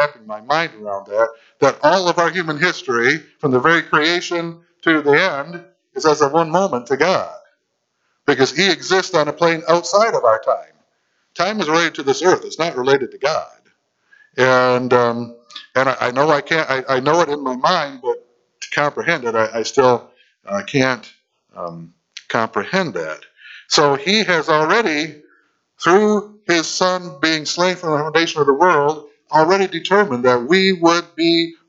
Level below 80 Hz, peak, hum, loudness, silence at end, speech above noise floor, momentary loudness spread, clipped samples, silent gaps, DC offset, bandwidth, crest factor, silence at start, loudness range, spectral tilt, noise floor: -64 dBFS; 0 dBFS; none; -17 LUFS; 0.15 s; 54 dB; 11 LU; under 0.1%; none; under 0.1%; 8 kHz; 18 dB; 0 s; 3 LU; -4 dB/octave; -70 dBFS